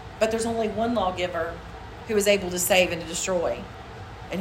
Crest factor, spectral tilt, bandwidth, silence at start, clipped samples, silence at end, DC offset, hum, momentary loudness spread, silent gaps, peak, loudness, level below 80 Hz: 18 dB; -3.5 dB/octave; 16 kHz; 0 s; under 0.1%; 0 s; under 0.1%; none; 19 LU; none; -8 dBFS; -25 LUFS; -46 dBFS